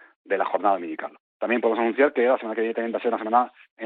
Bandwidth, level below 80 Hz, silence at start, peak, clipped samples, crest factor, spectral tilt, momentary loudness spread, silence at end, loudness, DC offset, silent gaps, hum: 4.3 kHz; -80 dBFS; 0.3 s; -6 dBFS; under 0.1%; 18 dB; -8.5 dB/octave; 11 LU; 0 s; -24 LUFS; under 0.1%; 1.20-1.40 s, 3.71-3.77 s; none